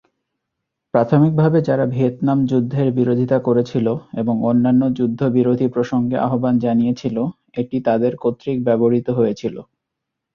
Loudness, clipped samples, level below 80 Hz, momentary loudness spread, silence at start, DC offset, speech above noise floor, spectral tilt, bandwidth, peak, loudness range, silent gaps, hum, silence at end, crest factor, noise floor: -18 LUFS; under 0.1%; -56 dBFS; 8 LU; 0.95 s; under 0.1%; 63 dB; -9.5 dB/octave; 6.8 kHz; -2 dBFS; 2 LU; none; none; 0.7 s; 16 dB; -80 dBFS